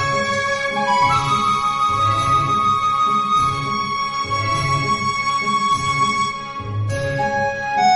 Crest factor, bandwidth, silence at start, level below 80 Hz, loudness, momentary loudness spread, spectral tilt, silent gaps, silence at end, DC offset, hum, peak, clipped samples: 14 dB; 11.5 kHz; 0 s; -46 dBFS; -18 LUFS; 5 LU; -4 dB/octave; none; 0 s; under 0.1%; none; -6 dBFS; under 0.1%